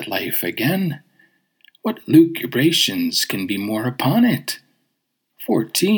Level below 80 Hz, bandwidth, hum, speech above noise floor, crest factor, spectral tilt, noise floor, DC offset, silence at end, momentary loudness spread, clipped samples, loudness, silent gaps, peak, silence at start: -72 dBFS; over 20 kHz; none; 55 dB; 18 dB; -4.5 dB/octave; -73 dBFS; under 0.1%; 0 s; 13 LU; under 0.1%; -19 LUFS; none; -2 dBFS; 0 s